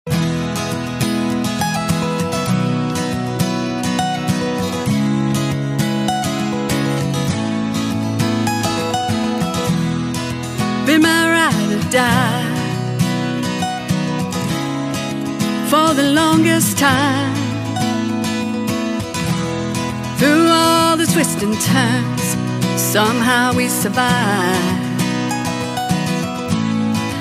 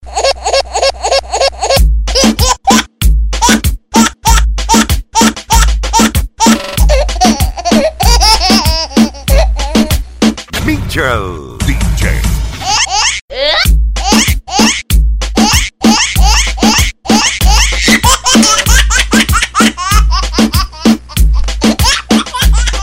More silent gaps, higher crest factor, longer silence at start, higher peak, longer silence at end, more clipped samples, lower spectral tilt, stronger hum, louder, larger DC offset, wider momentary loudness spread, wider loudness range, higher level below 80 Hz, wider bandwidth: second, none vs 13.21-13.28 s; first, 16 dB vs 10 dB; about the same, 0.05 s vs 0 s; about the same, 0 dBFS vs 0 dBFS; about the same, 0 s vs 0 s; neither; about the same, -4.5 dB/octave vs -3.5 dB/octave; neither; second, -17 LUFS vs -10 LUFS; second, under 0.1% vs 0.5%; about the same, 8 LU vs 6 LU; about the same, 4 LU vs 4 LU; second, -46 dBFS vs -14 dBFS; about the same, 16 kHz vs 16.5 kHz